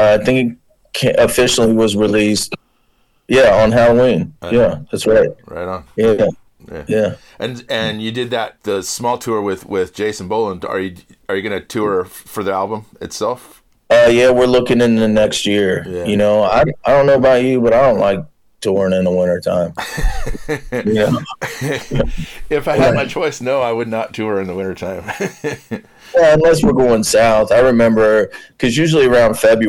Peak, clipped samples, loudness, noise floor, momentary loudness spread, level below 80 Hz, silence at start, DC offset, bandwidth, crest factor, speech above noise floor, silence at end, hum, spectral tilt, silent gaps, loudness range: -4 dBFS; under 0.1%; -15 LUFS; -58 dBFS; 13 LU; -34 dBFS; 0 s; under 0.1%; 16 kHz; 10 dB; 44 dB; 0 s; none; -5 dB/octave; none; 8 LU